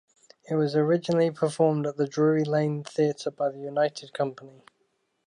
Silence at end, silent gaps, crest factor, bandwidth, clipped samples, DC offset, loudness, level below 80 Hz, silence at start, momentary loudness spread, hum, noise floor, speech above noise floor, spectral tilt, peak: 0.75 s; none; 16 dB; 10.5 kHz; under 0.1%; under 0.1%; -26 LUFS; -76 dBFS; 0.5 s; 7 LU; none; -73 dBFS; 47 dB; -7 dB/octave; -10 dBFS